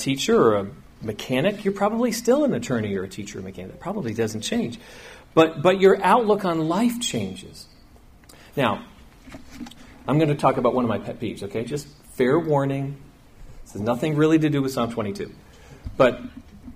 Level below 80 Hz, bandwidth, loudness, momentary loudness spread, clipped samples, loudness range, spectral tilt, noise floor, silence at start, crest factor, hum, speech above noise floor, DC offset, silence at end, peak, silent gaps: -50 dBFS; 15.5 kHz; -22 LUFS; 21 LU; under 0.1%; 5 LU; -5.5 dB/octave; -50 dBFS; 0 s; 20 dB; none; 27 dB; under 0.1%; 0 s; -4 dBFS; none